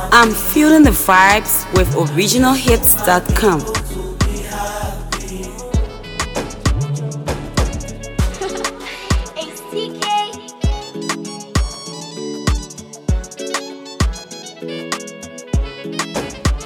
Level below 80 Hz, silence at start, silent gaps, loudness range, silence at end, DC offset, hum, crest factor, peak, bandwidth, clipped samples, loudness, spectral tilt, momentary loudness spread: -26 dBFS; 0 s; none; 12 LU; 0 s; under 0.1%; none; 18 dB; 0 dBFS; 19 kHz; under 0.1%; -17 LUFS; -4 dB/octave; 17 LU